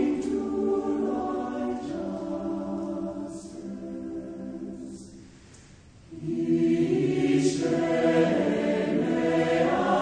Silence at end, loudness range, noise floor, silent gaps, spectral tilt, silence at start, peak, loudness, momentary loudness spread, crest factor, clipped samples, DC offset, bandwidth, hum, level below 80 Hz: 0 s; 13 LU; -51 dBFS; none; -6.5 dB/octave; 0 s; -10 dBFS; -27 LUFS; 15 LU; 16 dB; under 0.1%; under 0.1%; 9.8 kHz; none; -56 dBFS